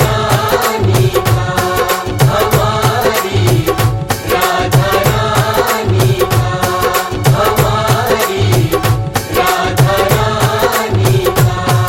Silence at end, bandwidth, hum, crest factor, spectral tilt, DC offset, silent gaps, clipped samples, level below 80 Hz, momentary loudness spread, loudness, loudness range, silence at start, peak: 0 s; 17 kHz; none; 12 dB; -5 dB/octave; under 0.1%; none; under 0.1%; -30 dBFS; 3 LU; -12 LUFS; 0 LU; 0 s; 0 dBFS